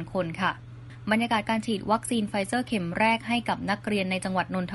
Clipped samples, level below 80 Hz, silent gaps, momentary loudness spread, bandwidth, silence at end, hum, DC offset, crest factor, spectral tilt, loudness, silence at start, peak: under 0.1%; -56 dBFS; none; 5 LU; 11.5 kHz; 0 s; none; under 0.1%; 18 dB; -5 dB/octave; -27 LUFS; 0 s; -10 dBFS